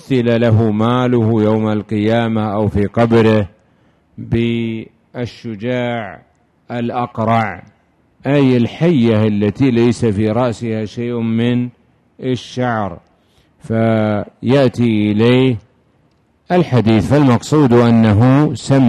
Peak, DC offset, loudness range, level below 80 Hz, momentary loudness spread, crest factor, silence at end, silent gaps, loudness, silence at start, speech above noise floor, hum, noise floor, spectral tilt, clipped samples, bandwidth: 0 dBFS; under 0.1%; 7 LU; -40 dBFS; 13 LU; 14 dB; 0 s; none; -15 LUFS; 0.1 s; 43 dB; none; -56 dBFS; -8 dB/octave; under 0.1%; 10 kHz